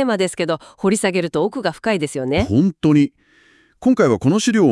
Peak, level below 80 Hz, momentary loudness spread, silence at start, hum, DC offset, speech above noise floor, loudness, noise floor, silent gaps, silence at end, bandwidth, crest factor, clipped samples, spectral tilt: -2 dBFS; -46 dBFS; 6 LU; 0 s; none; under 0.1%; 37 dB; -18 LUFS; -53 dBFS; none; 0 s; 12 kHz; 16 dB; under 0.1%; -5.5 dB/octave